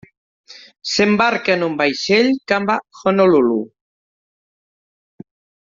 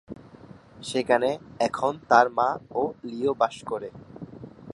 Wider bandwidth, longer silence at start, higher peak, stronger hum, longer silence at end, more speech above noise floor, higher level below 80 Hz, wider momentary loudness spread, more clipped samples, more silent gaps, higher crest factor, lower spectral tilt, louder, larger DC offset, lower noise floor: second, 7.6 kHz vs 11.5 kHz; first, 0.5 s vs 0.1 s; about the same, -2 dBFS vs -4 dBFS; neither; first, 2 s vs 0 s; first, over 74 dB vs 23 dB; about the same, -60 dBFS vs -62 dBFS; second, 8 LU vs 23 LU; neither; neither; second, 16 dB vs 24 dB; second, -3 dB/octave vs -4.5 dB/octave; first, -16 LUFS vs -25 LUFS; neither; first, under -90 dBFS vs -48 dBFS